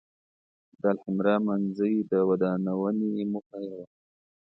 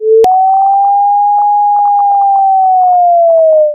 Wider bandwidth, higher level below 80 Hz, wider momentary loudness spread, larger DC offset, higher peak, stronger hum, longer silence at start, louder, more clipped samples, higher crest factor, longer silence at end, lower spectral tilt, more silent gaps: about the same, 5.6 kHz vs 6 kHz; second, -70 dBFS vs -56 dBFS; first, 13 LU vs 2 LU; neither; second, -10 dBFS vs 0 dBFS; neither; first, 0.85 s vs 0 s; second, -27 LUFS vs -8 LUFS; neither; first, 18 dB vs 6 dB; first, 0.7 s vs 0 s; first, -10.5 dB/octave vs -5 dB/octave; first, 3.46-3.50 s vs none